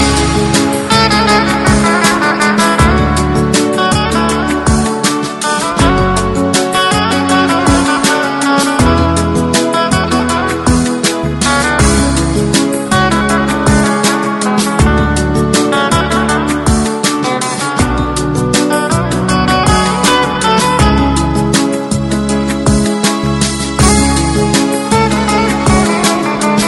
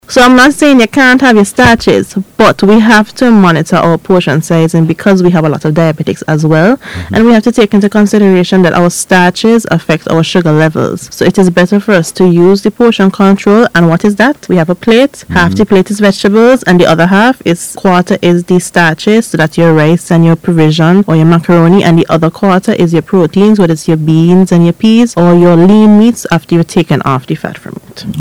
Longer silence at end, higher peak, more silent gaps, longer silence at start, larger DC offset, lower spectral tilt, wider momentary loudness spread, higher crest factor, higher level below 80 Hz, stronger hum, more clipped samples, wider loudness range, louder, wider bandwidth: about the same, 0 s vs 0 s; about the same, 0 dBFS vs 0 dBFS; neither; about the same, 0 s vs 0.1 s; second, under 0.1% vs 1%; second, -4.5 dB/octave vs -6 dB/octave; about the same, 4 LU vs 6 LU; about the same, 10 dB vs 6 dB; first, -22 dBFS vs -38 dBFS; neither; second, under 0.1% vs 3%; about the same, 2 LU vs 2 LU; second, -11 LUFS vs -7 LUFS; about the same, 15 kHz vs 15.5 kHz